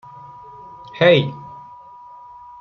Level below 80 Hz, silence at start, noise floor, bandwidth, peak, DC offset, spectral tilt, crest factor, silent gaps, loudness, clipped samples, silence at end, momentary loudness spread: -60 dBFS; 0.95 s; -41 dBFS; 6.6 kHz; -2 dBFS; under 0.1%; -7.5 dB/octave; 20 dB; none; -16 LUFS; under 0.1%; 1 s; 27 LU